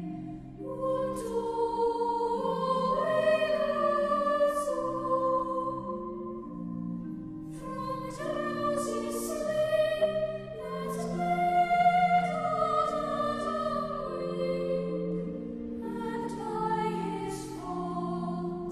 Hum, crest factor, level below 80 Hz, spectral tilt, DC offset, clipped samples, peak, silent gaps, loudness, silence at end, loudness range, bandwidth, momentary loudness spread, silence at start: none; 16 dB; -56 dBFS; -6 dB/octave; under 0.1%; under 0.1%; -14 dBFS; none; -30 LUFS; 0 s; 6 LU; 14.5 kHz; 12 LU; 0 s